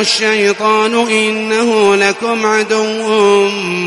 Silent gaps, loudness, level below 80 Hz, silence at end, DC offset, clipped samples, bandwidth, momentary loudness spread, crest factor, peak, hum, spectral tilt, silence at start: none; -12 LUFS; -58 dBFS; 0 s; under 0.1%; under 0.1%; 11.5 kHz; 4 LU; 12 dB; 0 dBFS; none; -3 dB/octave; 0 s